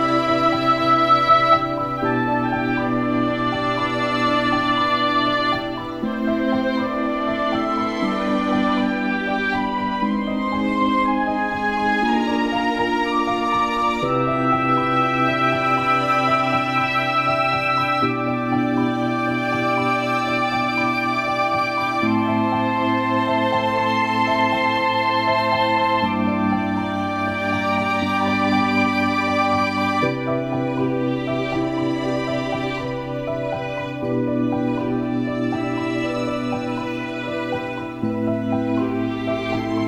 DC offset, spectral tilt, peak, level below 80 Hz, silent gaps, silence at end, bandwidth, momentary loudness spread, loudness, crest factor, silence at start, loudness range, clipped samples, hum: under 0.1%; -6 dB/octave; -2 dBFS; -48 dBFS; none; 0 s; 14.5 kHz; 6 LU; -20 LUFS; 18 dB; 0 s; 5 LU; under 0.1%; none